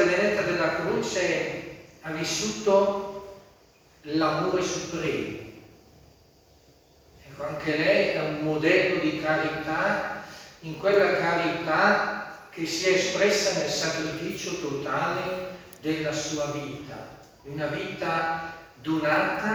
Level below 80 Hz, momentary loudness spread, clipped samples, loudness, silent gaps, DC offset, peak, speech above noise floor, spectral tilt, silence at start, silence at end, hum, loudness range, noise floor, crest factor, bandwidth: -60 dBFS; 17 LU; under 0.1%; -26 LUFS; none; under 0.1%; -8 dBFS; 32 dB; -4 dB/octave; 0 s; 0 s; none; 6 LU; -57 dBFS; 20 dB; over 20 kHz